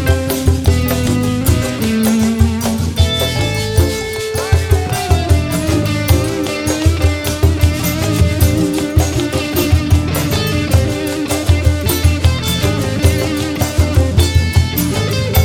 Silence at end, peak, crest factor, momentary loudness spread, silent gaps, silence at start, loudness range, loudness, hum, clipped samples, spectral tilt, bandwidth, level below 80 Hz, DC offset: 0 s; 0 dBFS; 14 dB; 4 LU; none; 0 s; 1 LU; -15 LUFS; none; under 0.1%; -5.5 dB/octave; 17.5 kHz; -22 dBFS; under 0.1%